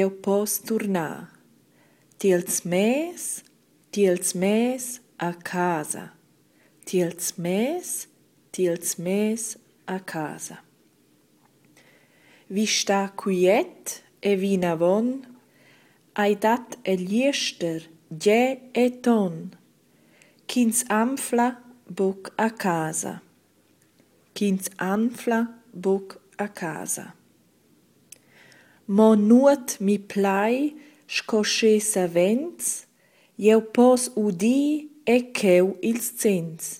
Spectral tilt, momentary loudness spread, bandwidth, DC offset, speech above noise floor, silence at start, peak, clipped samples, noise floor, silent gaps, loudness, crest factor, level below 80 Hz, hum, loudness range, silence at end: -4.5 dB/octave; 14 LU; 16.5 kHz; under 0.1%; 39 dB; 0 s; -6 dBFS; under 0.1%; -61 dBFS; none; -24 LUFS; 20 dB; -72 dBFS; none; 7 LU; 0 s